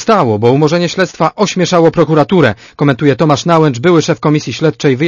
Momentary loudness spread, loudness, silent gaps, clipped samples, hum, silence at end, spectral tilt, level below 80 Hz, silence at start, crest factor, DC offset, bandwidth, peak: 4 LU; -11 LUFS; none; 0.6%; none; 0 s; -6 dB/octave; -46 dBFS; 0 s; 10 dB; under 0.1%; 7.4 kHz; 0 dBFS